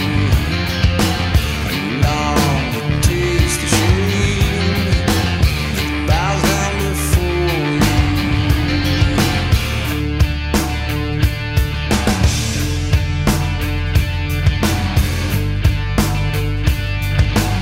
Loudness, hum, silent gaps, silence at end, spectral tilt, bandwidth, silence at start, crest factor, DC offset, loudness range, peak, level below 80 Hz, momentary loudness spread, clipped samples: -17 LUFS; none; none; 0 s; -5 dB/octave; 16.5 kHz; 0 s; 16 dB; under 0.1%; 2 LU; 0 dBFS; -22 dBFS; 4 LU; under 0.1%